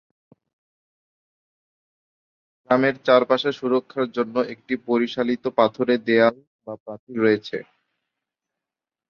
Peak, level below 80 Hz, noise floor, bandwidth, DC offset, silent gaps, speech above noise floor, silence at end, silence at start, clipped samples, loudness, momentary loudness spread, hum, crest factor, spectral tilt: -2 dBFS; -70 dBFS; -89 dBFS; 6.8 kHz; under 0.1%; 6.47-6.59 s, 6.80-6.86 s, 6.99-7.07 s; 67 dB; 1.45 s; 2.7 s; under 0.1%; -21 LUFS; 16 LU; none; 22 dB; -6.5 dB/octave